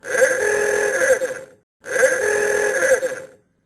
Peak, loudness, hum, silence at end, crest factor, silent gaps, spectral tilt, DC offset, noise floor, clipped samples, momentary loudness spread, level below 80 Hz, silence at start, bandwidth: -4 dBFS; -18 LUFS; none; 0.4 s; 14 dB; 1.63-1.80 s; -1.5 dB/octave; under 0.1%; -39 dBFS; under 0.1%; 10 LU; -58 dBFS; 0.05 s; 13.5 kHz